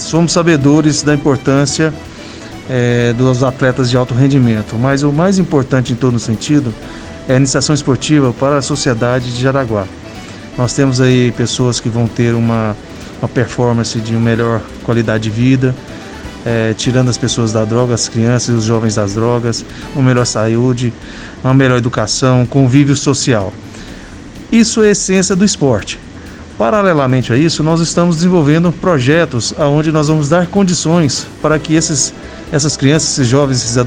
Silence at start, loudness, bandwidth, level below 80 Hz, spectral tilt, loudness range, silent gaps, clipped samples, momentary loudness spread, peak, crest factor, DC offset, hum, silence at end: 0 s; -12 LUFS; 10 kHz; -38 dBFS; -5.5 dB/octave; 3 LU; none; 0.2%; 14 LU; 0 dBFS; 12 dB; under 0.1%; none; 0 s